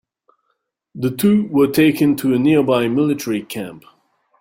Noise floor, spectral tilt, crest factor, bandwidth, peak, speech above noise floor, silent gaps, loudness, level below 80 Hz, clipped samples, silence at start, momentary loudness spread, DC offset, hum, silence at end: -71 dBFS; -6 dB/octave; 16 dB; 16.5 kHz; -2 dBFS; 55 dB; none; -16 LUFS; -56 dBFS; under 0.1%; 0.95 s; 10 LU; under 0.1%; none; 0.6 s